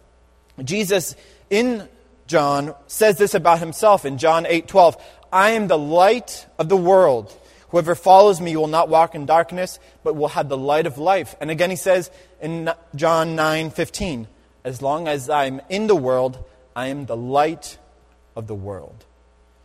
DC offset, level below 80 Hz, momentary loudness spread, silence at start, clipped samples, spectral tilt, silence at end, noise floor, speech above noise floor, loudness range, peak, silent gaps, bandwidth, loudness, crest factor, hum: under 0.1%; -52 dBFS; 16 LU; 0.6 s; under 0.1%; -4.5 dB/octave; 0.8 s; -54 dBFS; 36 dB; 7 LU; 0 dBFS; none; 16 kHz; -18 LUFS; 20 dB; none